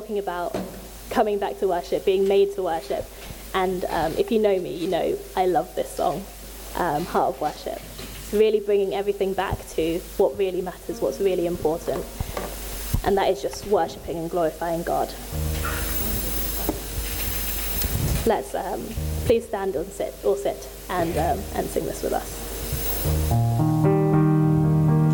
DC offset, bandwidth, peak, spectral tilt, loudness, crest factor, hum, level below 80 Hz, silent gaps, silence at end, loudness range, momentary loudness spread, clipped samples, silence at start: under 0.1%; 17.5 kHz; -8 dBFS; -6 dB/octave; -24 LUFS; 16 dB; none; -36 dBFS; none; 0 s; 2 LU; 11 LU; under 0.1%; 0 s